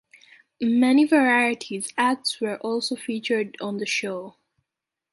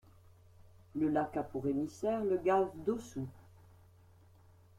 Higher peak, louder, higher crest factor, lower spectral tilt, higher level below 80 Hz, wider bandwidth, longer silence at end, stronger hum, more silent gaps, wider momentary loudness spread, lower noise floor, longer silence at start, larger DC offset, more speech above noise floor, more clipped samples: first, -6 dBFS vs -20 dBFS; first, -23 LUFS vs -35 LUFS; about the same, 18 dB vs 18 dB; second, -3.5 dB/octave vs -7.5 dB/octave; second, -74 dBFS vs -66 dBFS; second, 11.5 kHz vs 14.5 kHz; second, 0.8 s vs 1.4 s; neither; neither; about the same, 12 LU vs 13 LU; first, -86 dBFS vs -62 dBFS; about the same, 0.6 s vs 0.6 s; neither; first, 63 dB vs 28 dB; neither